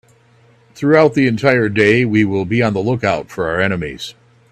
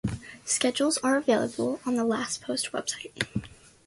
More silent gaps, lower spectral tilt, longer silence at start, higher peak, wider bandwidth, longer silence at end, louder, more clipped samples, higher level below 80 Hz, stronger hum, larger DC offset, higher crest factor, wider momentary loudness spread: neither; first, -7 dB/octave vs -3.5 dB/octave; first, 0.75 s vs 0.05 s; first, 0 dBFS vs -8 dBFS; first, 13.5 kHz vs 12 kHz; about the same, 0.4 s vs 0.4 s; first, -15 LUFS vs -28 LUFS; neither; first, -48 dBFS vs -54 dBFS; neither; neither; about the same, 16 dB vs 20 dB; about the same, 10 LU vs 9 LU